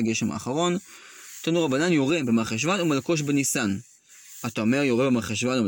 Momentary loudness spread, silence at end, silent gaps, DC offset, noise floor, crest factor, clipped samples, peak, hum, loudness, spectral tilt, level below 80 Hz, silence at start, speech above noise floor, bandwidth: 12 LU; 0 s; none; under 0.1%; -49 dBFS; 14 dB; under 0.1%; -10 dBFS; none; -24 LUFS; -4.5 dB/octave; -62 dBFS; 0 s; 25 dB; 17 kHz